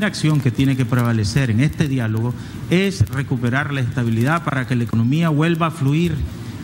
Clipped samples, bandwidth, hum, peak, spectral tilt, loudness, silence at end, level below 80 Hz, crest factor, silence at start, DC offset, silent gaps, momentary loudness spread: under 0.1%; 16 kHz; none; -4 dBFS; -6.5 dB/octave; -19 LUFS; 0 s; -40 dBFS; 14 dB; 0 s; under 0.1%; none; 4 LU